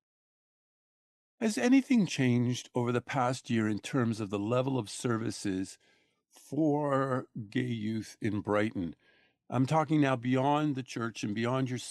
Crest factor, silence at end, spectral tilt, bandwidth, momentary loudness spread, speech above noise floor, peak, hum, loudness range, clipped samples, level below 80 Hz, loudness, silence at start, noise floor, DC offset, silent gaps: 18 dB; 0 s; -6 dB/octave; 12.5 kHz; 9 LU; over 60 dB; -14 dBFS; none; 4 LU; under 0.1%; -72 dBFS; -31 LUFS; 1.4 s; under -90 dBFS; under 0.1%; none